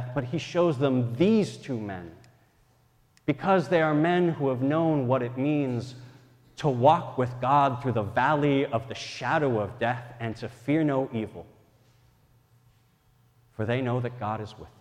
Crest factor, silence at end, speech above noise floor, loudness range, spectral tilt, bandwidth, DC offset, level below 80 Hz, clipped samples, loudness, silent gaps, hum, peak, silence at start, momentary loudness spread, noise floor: 20 dB; 0.1 s; 38 dB; 8 LU; -7.5 dB/octave; 10.5 kHz; under 0.1%; -62 dBFS; under 0.1%; -26 LUFS; none; none; -6 dBFS; 0 s; 13 LU; -63 dBFS